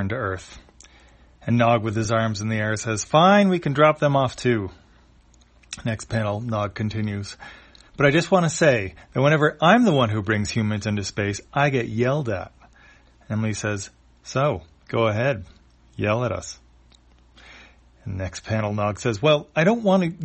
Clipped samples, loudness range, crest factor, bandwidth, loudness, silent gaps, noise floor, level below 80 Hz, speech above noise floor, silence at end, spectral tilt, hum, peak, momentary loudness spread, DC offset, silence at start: under 0.1%; 8 LU; 20 dB; 8.8 kHz; -22 LUFS; none; -54 dBFS; -52 dBFS; 33 dB; 0 s; -5.5 dB/octave; none; -2 dBFS; 14 LU; under 0.1%; 0 s